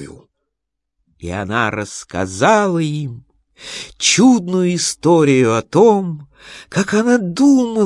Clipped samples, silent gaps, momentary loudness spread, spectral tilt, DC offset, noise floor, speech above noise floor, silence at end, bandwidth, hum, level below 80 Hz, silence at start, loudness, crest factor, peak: under 0.1%; none; 17 LU; -4.5 dB/octave; under 0.1%; -79 dBFS; 64 dB; 0 s; 11.5 kHz; none; -54 dBFS; 0 s; -15 LUFS; 16 dB; 0 dBFS